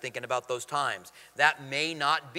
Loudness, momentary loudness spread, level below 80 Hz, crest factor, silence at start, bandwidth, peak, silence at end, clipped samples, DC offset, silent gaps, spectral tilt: -28 LUFS; 8 LU; -76 dBFS; 24 dB; 0 s; 16 kHz; -6 dBFS; 0 s; under 0.1%; under 0.1%; none; -2.5 dB/octave